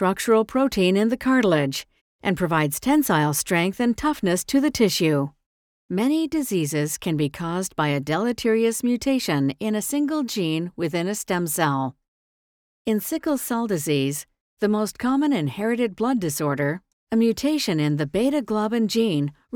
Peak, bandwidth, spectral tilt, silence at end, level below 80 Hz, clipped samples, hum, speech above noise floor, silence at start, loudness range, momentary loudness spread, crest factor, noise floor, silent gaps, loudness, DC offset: -6 dBFS; over 20 kHz; -5 dB/octave; 0 s; -54 dBFS; under 0.1%; none; over 68 dB; 0 s; 4 LU; 6 LU; 16 dB; under -90 dBFS; 2.01-2.19 s, 5.46-5.89 s, 12.08-12.85 s, 14.40-14.57 s, 16.93-17.07 s; -23 LUFS; under 0.1%